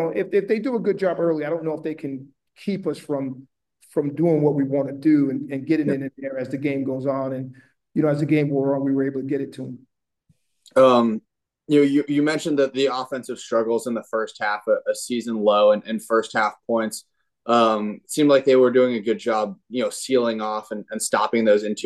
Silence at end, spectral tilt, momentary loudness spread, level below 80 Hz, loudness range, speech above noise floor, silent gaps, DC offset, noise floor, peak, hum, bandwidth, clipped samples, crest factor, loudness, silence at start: 0 s; -5.5 dB/octave; 12 LU; -72 dBFS; 5 LU; 45 dB; none; under 0.1%; -66 dBFS; -4 dBFS; none; 12.5 kHz; under 0.1%; 18 dB; -22 LUFS; 0 s